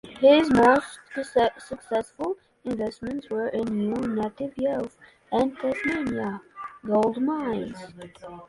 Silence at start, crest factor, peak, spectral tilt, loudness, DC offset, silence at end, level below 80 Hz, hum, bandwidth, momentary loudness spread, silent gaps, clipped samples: 0.05 s; 20 dB; -6 dBFS; -6 dB/octave; -25 LUFS; under 0.1%; 0.05 s; -56 dBFS; none; 11.5 kHz; 19 LU; none; under 0.1%